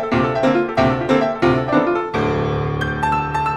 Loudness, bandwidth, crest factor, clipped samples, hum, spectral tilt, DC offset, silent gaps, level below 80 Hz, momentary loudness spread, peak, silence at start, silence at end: -18 LUFS; 11.5 kHz; 16 dB; under 0.1%; none; -7 dB/octave; under 0.1%; none; -38 dBFS; 4 LU; -2 dBFS; 0 s; 0 s